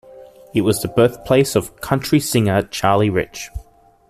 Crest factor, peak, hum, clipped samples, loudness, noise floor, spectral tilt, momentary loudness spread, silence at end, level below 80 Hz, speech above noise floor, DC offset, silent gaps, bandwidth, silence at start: 16 dB; -2 dBFS; none; under 0.1%; -18 LUFS; -42 dBFS; -5.5 dB/octave; 11 LU; 0.5 s; -42 dBFS; 25 dB; under 0.1%; none; 15 kHz; 0.15 s